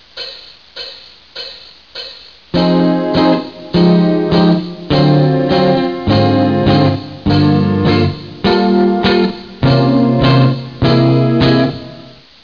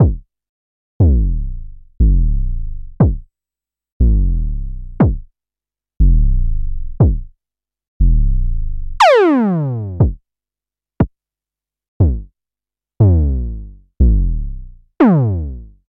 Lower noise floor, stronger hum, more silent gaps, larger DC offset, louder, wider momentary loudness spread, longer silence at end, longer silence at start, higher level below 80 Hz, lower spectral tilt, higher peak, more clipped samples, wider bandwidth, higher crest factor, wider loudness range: second, -37 dBFS vs under -90 dBFS; second, none vs 50 Hz at -40 dBFS; second, none vs 0.49-1.00 s, 3.92-4.00 s, 7.88-8.00 s, 11.88-12.00 s; first, 0.4% vs under 0.1%; first, -12 LUFS vs -16 LUFS; about the same, 17 LU vs 17 LU; about the same, 0.4 s vs 0.3 s; first, 0.15 s vs 0 s; second, -36 dBFS vs -18 dBFS; about the same, -8.5 dB/octave vs -8.5 dB/octave; about the same, 0 dBFS vs -2 dBFS; neither; second, 5.4 kHz vs 7.8 kHz; about the same, 12 dB vs 12 dB; about the same, 4 LU vs 4 LU